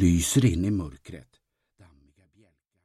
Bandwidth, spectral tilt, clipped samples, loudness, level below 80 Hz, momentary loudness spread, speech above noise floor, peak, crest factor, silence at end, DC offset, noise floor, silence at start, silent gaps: 16 kHz; -5.5 dB/octave; under 0.1%; -24 LUFS; -42 dBFS; 24 LU; 41 dB; -10 dBFS; 18 dB; 1.65 s; under 0.1%; -65 dBFS; 0 s; none